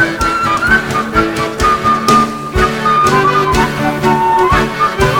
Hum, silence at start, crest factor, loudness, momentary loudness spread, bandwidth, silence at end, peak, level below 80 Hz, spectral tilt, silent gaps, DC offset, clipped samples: none; 0 s; 12 dB; -12 LUFS; 4 LU; 19 kHz; 0 s; 0 dBFS; -26 dBFS; -5 dB/octave; none; under 0.1%; under 0.1%